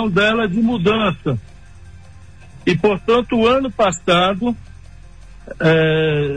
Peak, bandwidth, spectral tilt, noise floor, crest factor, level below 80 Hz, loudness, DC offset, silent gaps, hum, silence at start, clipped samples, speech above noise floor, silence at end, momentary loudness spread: -4 dBFS; 10 kHz; -6 dB/octave; -41 dBFS; 14 dB; -42 dBFS; -16 LUFS; 0.6%; none; none; 0 s; under 0.1%; 25 dB; 0 s; 9 LU